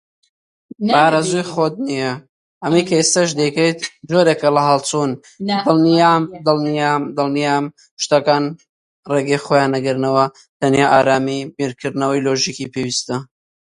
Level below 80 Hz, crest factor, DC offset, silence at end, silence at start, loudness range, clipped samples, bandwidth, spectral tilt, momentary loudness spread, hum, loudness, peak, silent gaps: -60 dBFS; 16 dB; under 0.1%; 0.45 s; 0.8 s; 2 LU; under 0.1%; 11.5 kHz; -4.5 dB/octave; 11 LU; none; -17 LUFS; 0 dBFS; 2.29-2.61 s, 7.91-7.97 s, 8.69-9.03 s, 10.49-10.60 s